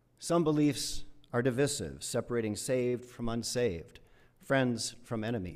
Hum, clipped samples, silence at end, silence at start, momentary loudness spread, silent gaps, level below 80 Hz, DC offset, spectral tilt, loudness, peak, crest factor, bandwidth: none; under 0.1%; 0 s; 0.2 s; 8 LU; none; -54 dBFS; under 0.1%; -5 dB/octave; -32 LUFS; -14 dBFS; 18 dB; 15.5 kHz